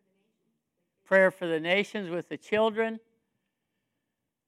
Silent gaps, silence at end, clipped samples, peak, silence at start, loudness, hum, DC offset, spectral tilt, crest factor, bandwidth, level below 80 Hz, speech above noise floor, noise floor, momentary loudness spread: none; 1.5 s; under 0.1%; -10 dBFS; 1.1 s; -27 LUFS; none; under 0.1%; -5.5 dB/octave; 20 dB; 12.5 kHz; -82 dBFS; 57 dB; -84 dBFS; 12 LU